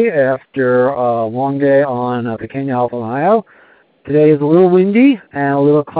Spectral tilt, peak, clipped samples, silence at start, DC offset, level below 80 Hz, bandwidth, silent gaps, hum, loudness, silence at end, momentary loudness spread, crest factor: -12.5 dB/octave; 0 dBFS; under 0.1%; 0 s; under 0.1%; -60 dBFS; 4.6 kHz; none; none; -14 LUFS; 0 s; 8 LU; 12 dB